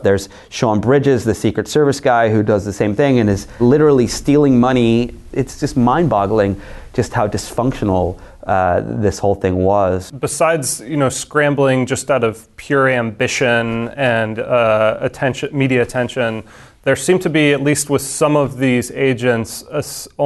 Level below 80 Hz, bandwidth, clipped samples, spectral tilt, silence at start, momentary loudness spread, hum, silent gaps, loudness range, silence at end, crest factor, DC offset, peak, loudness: -40 dBFS; 12.5 kHz; under 0.1%; -5.5 dB/octave; 0 s; 8 LU; none; none; 3 LU; 0 s; 12 dB; under 0.1%; -2 dBFS; -16 LUFS